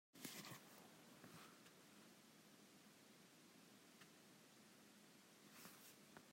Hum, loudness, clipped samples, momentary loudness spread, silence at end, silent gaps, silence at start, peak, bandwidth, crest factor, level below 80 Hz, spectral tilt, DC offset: none; -63 LUFS; under 0.1%; 10 LU; 0 s; none; 0.15 s; -32 dBFS; 16 kHz; 32 dB; under -90 dBFS; -2.5 dB/octave; under 0.1%